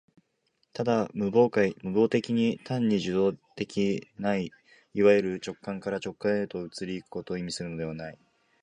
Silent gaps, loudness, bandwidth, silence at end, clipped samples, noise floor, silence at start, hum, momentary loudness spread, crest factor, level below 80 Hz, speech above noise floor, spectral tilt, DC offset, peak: none; -28 LUFS; 10.5 kHz; 0.5 s; under 0.1%; -74 dBFS; 0.75 s; none; 13 LU; 20 dB; -62 dBFS; 47 dB; -6.5 dB/octave; under 0.1%; -8 dBFS